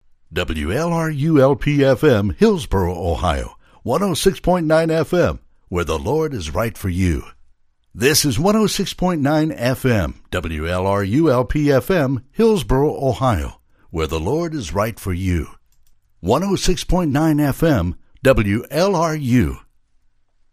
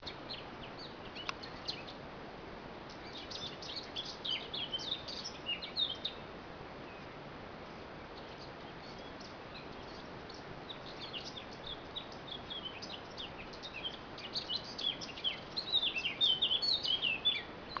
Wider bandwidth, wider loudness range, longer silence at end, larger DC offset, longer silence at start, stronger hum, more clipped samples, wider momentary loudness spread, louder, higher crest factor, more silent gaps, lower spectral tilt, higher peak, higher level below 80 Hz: first, 15.5 kHz vs 5.4 kHz; second, 4 LU vs 15 LU; first, 0.95 s vs 0 s; neither; first, 0.3 s vs 0 s; neither; neither; second, 9 LU vs 17 LU; first, -18 LUFS vs -38 LUFS; about the same, 18 dB vs 22 dB; neither; first, -5.5 dB/octave vs -3 dB/octave; first, 0 dBFS vs -20 dBFS; first, -32 dBFS vs -62 dBFS